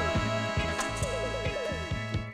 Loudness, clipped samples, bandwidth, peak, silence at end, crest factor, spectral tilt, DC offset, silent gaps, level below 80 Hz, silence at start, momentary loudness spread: -31 LUFS; under 0.1%; 15.5 kHz; -18 dBFS; 0 s; 14 dB; -4.5 dB/octave; under 0.1%; none; -42 dBFS; 0 s; 4 LU